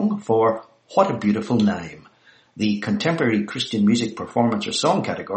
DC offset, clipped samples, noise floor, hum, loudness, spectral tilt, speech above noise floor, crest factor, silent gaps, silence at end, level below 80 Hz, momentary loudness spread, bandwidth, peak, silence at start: under 0.1%; under 0.1%; -54 dBFS; none; -21 LUFS; -5.5 dB/octave; 33 dB; 18 dB; none; 0 s; -60 dBFS; 6 LU; 8.6 kHz; -2 dBFS; 0 s